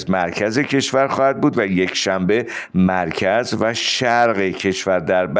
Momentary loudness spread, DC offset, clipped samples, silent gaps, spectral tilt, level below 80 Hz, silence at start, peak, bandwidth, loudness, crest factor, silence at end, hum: 4 LU; under 0.1%; under 0.1%; none; -4.5 dB/octave; -54 dBFS; 0 s; -4 dBFS; 9.8 kHz; -18 LUFS; 14 dB; 0 s; none